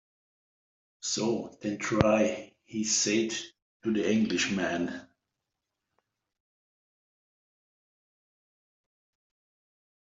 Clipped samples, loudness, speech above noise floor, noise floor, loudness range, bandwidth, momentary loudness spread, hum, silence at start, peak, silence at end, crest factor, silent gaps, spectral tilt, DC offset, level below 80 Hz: under 0.1%; -29 LUFS; 58 dB; -86 dBFS; 8 LU; 8.2 kHz; 13 LU; none; 1.05 s; -2 dBFS; 5 s; 30 dB; 3.62-3.80 s; -3.5 dB/octave; under 0.1%; -62 dBFS